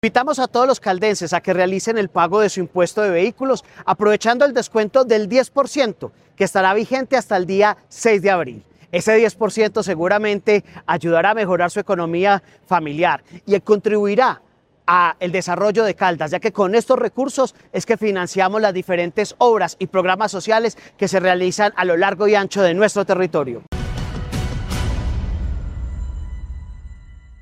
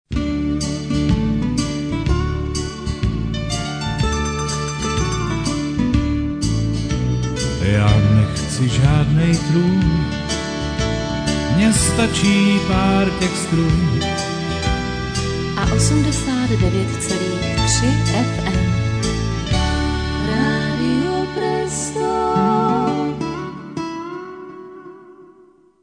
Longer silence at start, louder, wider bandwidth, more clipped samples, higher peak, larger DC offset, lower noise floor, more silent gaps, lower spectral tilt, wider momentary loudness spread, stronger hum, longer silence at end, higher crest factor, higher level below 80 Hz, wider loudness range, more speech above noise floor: about the same, 0.05 s vs 0.1 s; about the same, -18 LUFS vs -19 LUFS; first, 14 kHz vs 10 kHz; neither; about the same, 0 dBFS vs -2 dBFS; neither; second, -40 dBFS vs -50 dBFS; neither; about the same, -5 dB/octave vs -5.5 dB/octave; about the same, 10 LU vs 8 LU; neither; second, 0.05 s vs 0.6 s; about the same, 18 dB vs 16 dB; second, -36 dBFS vs -28 dBFS; second, 2 LU vs 5 LU; second, 22 dB vs 34 dB